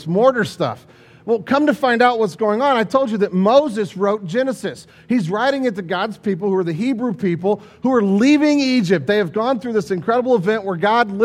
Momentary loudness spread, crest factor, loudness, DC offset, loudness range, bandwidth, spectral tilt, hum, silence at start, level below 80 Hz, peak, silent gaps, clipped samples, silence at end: 8 LU; 16 dB; -18 LUFS; under 0.1%; 4 LU; 14 kHz; -6.5 dB/octave; none; 0 s; -60 dBFS; 0 dBFS; none; under 0.1%; 0 s